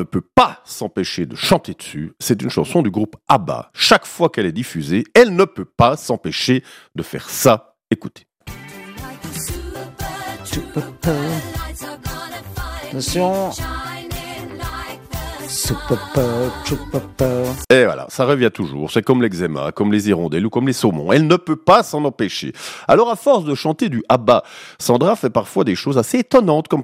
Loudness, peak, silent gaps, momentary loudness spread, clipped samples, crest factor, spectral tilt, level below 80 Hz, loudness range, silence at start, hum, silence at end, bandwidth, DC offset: -18 LUFS; 0 dBFS; none; 15 LU; under 0.1%; 18 dB; -5 dB/octave; -40 dBFS; 9 LU; 0 s; none; 0 s; 16 kHz; under 0.1%